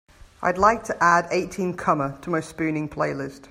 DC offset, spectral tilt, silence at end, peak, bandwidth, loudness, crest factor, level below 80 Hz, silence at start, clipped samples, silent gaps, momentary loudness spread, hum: under 0.1%; -5.5 dB/octave; 0.1 s; -2 dBFS; 16 kHz; -23 LUFS; 20 dB; -50 dBFS; 0.4 s; under 0.1%; none; 9 LU; none